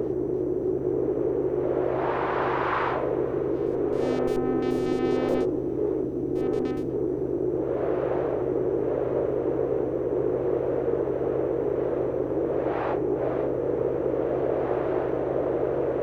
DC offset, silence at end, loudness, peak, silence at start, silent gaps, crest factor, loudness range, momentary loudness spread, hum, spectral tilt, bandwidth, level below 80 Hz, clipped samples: under 0.1%; 0 s; -26 LUFS; -12 dBFS; 0 s; none; 14 dB; 1 LU; 2 LU; none; -8.5 dB/octave; 8.2 kHz; -48 dBFS; under 0.1%